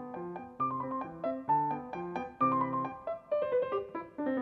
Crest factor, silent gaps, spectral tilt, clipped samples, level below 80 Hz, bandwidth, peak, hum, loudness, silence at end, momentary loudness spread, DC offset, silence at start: 16 dB; none; -9 dB/octave; under 0.1%; -70 dBFS; 6 kHz; -18 dBFS; none; -34 LUFS; 0 s; 11 LU; under 0.1%; 0 s